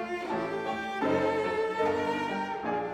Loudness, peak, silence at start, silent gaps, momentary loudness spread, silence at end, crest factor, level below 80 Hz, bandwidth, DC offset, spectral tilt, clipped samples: -30 LUFS; -16 dBFS; 0 s; none; 5 LU; 0 s; 14 dB; -64 dBFS; 13 kHz; under 0.1%; -5.5 dB/octave; under 0.1%